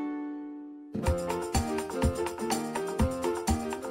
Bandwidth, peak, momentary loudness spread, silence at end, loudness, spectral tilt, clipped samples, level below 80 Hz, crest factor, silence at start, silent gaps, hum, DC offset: 16 kHz; -14 dBFS; 9 LU; 0 s; -31 LUFS; -5.5 dB/octave; under 0.1%; -40 dBFS; 18 dB; 0 s; none; none; under 0.1%